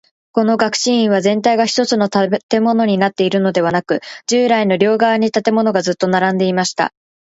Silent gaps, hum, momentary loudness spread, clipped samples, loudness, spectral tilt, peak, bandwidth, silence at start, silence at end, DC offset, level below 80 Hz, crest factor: 2.43-2.49 s; none; 5 LU; under 0.1%; -15 LUFS; -4.5 dB/octave; 0 dBFS; 8 kHz; 0.35 s; 0.5 s; under 0.1%; -60 dBFS; 14 dB